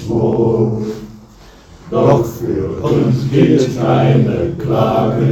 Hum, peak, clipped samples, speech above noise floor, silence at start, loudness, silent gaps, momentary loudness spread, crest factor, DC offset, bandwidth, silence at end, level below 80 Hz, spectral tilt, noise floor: none; 0 dBFS; under 0.1%; 27 dB; 0 s; -14 LUFS; none; 8 LU; 14 dB; under 0.1%; 14 kHz; 0 s; -38 dBFS; -8.5 dB/octave; -40 dBFS